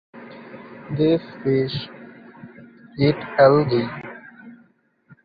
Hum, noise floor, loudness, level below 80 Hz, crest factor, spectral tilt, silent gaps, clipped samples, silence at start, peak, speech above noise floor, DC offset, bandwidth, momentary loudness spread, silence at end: none; -59 dBFS; -20 LUFS; -56 dBFS; 20 dB; -10 dB/octave; none; under 0.1%; 0.15 s; -2 dBFS; 40 dB; under 0.1%; 5 kHz; 27 LU; 0.7 s